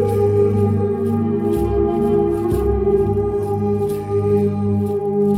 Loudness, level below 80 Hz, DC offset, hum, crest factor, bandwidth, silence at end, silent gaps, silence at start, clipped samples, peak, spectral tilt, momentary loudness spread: -18 LUFS; -32 dBFS; under 0.1%; 50 Hz at -35 dBFS; 12 dB; 15 kHz; 0 s; none; 0 s; under 0.1%; -6 dBFS; -9.5 dB/octave; 4 LU